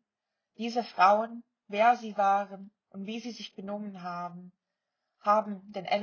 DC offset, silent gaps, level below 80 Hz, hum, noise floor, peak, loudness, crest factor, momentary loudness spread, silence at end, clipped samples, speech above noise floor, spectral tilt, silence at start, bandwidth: under 0.1%; none; -82 dBFS; none; -87 dBFS; -10 dBFS; -29 LUFS; 20 dB; 18 LU; 0 s; under 0.1%; 58 dB; -5 dB/octave; 0.6 s; 7 kHz